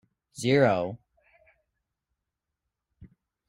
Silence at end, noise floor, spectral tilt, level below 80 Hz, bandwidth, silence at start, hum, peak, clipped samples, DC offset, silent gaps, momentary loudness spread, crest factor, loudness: 0.4 s; -86 dBFS; -6 dB/octave; -66 dBFS; 14 kHz; 0.35 s; none; -8 dBFS; under 0.1%; under 0.1%; none; 25 LU; 22 dB; -25 LUFS